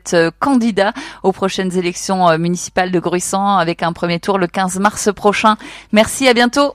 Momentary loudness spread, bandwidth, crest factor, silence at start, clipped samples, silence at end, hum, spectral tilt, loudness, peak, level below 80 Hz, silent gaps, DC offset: 6 LU; 15.5 kHz; 14 dB; 0.05 s; under 0.1%; 0 s; none; -4.5 dB/octave; -15 LUFS; 0 dBFS; -48 dBFS; none; under 0.1%